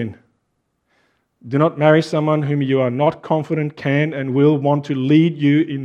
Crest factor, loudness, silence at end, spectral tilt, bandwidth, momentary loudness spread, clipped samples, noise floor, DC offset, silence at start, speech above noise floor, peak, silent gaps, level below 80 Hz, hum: 18 dB; -17 LUFS; 0 s; -8.5 dB/octave; 9 kHz; 7 LU; under 0.1%; -70 dBFS; under 0.1%; 0 s; 54 dB; 0 dBFS; none; -64 dBFS; none